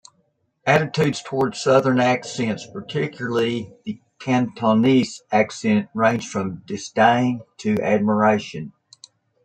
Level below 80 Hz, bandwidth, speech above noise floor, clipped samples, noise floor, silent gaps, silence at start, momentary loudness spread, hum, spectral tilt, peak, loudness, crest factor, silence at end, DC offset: -62 dBFS; 9.2 kHz; 47 dB; under 0.1%; -67 dBFS; none; 0.65 s; 13 LU; none; -6 dB/octave; -2 dBFS; -20 LUFS; 20 dB; 0.75 s; under 0.1%